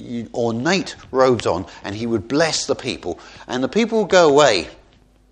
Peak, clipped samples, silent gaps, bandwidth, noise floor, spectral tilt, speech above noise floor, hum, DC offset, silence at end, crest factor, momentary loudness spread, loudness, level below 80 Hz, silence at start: 0 dBFS; under 0.1%; none; 10 kHz; -53 dBFS; -4 dB/octave; 34 dB; none; under 0.1%; 0.55 s; 20 dB; 15 LU; -18 LUFS; -50 dBFS; 0 s